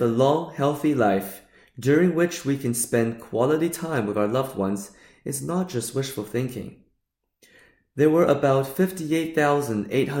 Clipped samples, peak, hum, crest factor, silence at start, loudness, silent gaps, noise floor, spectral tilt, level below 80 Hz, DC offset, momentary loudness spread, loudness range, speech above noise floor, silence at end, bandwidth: under 0.1%; -6 dBFS; none; 18 dB; 0 s; -23 LUFS; none; -76 dBFS; -6 dB/octave; -62 dBFS; under 0.1%; 12 LU; 6 LU; 53 dB; 0 s; 17 kHz